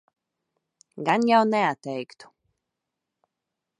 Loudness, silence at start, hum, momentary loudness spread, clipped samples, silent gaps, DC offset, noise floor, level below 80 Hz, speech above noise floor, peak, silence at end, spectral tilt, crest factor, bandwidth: -23 LUFS; 0.95 s; none; 15 LU; under 0.1%; none; under 0.1%; -85 dBFS; -78 dBFS; 61 dB; -6 dBFS; 1.55 s; -5.5 dB/octave; 20 dB; 10.5 kHz